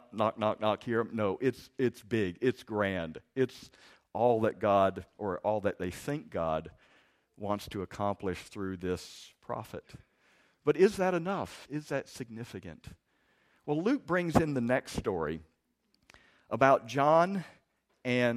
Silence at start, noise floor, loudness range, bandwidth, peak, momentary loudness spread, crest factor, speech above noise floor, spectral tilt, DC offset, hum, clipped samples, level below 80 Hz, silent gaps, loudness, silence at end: 0.1 s; -75 dBFS; 6 LU; 15 kHz; -8 dBFS; 16 LU; 24 dB; 44 dB; -6.5 dB/octave; under 0.1%; none; under 0.1%; -60 dBFS; none; -31 LUFS; 0 s